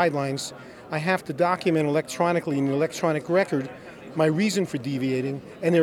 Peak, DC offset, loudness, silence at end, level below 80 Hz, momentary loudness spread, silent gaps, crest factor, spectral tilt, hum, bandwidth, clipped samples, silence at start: -8 dBFS; under 0.1%; -25 LUFS; 0 s; -66 dBFS; 10 LU; none; 18 dB; -6 dB/octave; none; 17 kHz; under 0.1%; 0 s